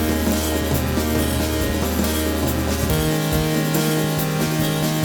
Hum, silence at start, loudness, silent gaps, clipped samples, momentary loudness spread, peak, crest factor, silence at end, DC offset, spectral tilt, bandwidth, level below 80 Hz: none; 0 s; -20 LUFS; none; under 0.1%; 2 LU; -4 dBFS; 16 dB; 0 s; under 0.1%; -5 dB/octave; over 20 kHz; -30 dBFS